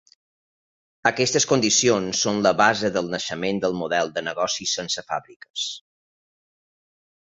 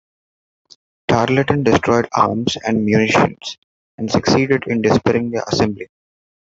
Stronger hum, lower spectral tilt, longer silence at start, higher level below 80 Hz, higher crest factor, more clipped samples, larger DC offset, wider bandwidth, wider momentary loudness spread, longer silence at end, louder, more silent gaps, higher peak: neither; second, -2.5 dB/octave vs -5.5 dB/octave; about the same, 1.05 s vs 1.1 s; second, -60 dBFS vs -50 dBFS; first, 22 dB vs 16 dB; neither; neither; about the same, 8.2 kHz vs 8 kHz; about the same, 11 LU vs 13 LU; first, 1.6 s vs 0.7 s; second, -22 LUFS vs -16 LUFS; second, 5.36-5.40 s, 5.50-5.54 s vs 3.58-3.98 s; about the same, -2 dBFS vs -2 dBFS